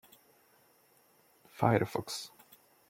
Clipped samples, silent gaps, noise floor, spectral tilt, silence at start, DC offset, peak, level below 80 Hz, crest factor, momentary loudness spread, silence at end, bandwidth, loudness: under 0.1%; none; -67 dBFS; -5.5 dB/octave; 1.55 s; under 0.1%; -10 dBFS; -70 dBFS; 26 dB; 20 LU; 0.6 s; 16.5 kHz; -32 LUFS